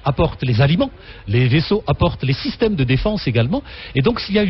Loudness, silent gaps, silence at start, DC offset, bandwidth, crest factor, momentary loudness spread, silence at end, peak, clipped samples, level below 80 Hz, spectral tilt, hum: -18 LUFS; none; 0.05 s; under 0.1%; 6 kHz; 14 dB; 6 LU; 0 s; -4 dBFS; under 0.1%; -34 dBFS; -9 dB/octave; none